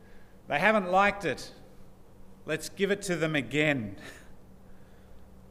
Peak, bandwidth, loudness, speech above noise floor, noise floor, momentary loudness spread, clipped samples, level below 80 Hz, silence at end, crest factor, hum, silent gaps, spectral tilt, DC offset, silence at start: -8 dBFS; 15.5 kHz; -28 LUFS; 21 dB; -49 dBFS; 21 LU; under 0.1%; -56 dBFS; 0 s; 24 dB; none; none; -5 dB/octave; under 0.1%; 0 s